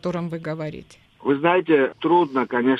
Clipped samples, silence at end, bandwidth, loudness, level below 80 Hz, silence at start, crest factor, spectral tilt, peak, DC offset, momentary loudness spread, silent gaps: under 0.1%; 0 s; 8.2 kHz; -21 LUFS; -62 dBFS; 0.05 s; 18 dB; -7.5 dB/octave; -2 dBFS; under 0.1%; 12 LU; none